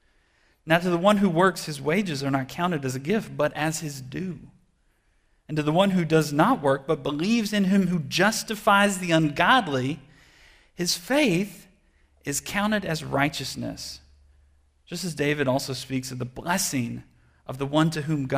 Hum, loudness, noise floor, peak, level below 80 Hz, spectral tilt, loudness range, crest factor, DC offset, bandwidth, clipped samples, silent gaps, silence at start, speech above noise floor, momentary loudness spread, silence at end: none; -24 LUFS; -66 dBFS; -6 dBFS; -56 dBFS; -4.5 dB/octave; 7 LU; 20 dB; under 0.1%; 16 kHz; under 0.1%; none; 0.65 s; 42 dB; 13 LU; 0 s